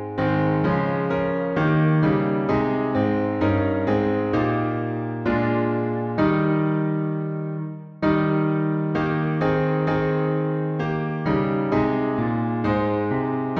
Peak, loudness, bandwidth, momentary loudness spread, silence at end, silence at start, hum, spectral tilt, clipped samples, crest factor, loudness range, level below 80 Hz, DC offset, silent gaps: -8 dBFS; -22 LUFS; 6 kHz; 5 LU; 0 s; 0 s; none; -10 dB/octave; under 0.1%; 14 dB; 2 LU; -48 dBFS; under 0.1%; none